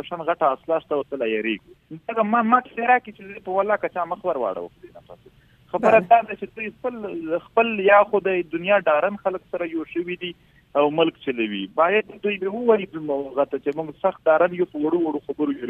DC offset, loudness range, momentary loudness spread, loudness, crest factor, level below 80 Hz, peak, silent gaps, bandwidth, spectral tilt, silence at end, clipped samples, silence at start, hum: under 0.1%; 3 LU; 12 LU; -22 LUFS; 20 dB; -62 dBFS; -2 dBFS; none; 7 kHz; -7.5 dB/octave; 0 s; under 0.1%; 0.05 s; none